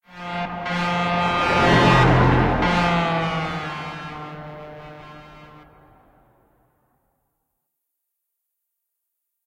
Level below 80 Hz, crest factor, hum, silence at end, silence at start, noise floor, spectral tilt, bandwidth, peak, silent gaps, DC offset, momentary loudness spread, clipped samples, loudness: -38 dBFS; 20 dB; none; 4 s; 0.15 s; -79 dBFS; -6 dB/octave; 10.5 kHz; -4 dBFS; none; under 0.1%; 23 LU; under 0.1%; -19 LUFS